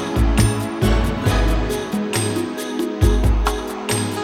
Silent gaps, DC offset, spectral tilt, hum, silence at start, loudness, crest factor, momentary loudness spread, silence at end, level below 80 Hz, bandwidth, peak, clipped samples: none; under 0.1%; -5.5 dB/octave; none; 0 s; -20 LUFS; 14 dB; 7 LU; 0 s; -22 dBFS; 16 kHz; -4 dBFS; under 0.1%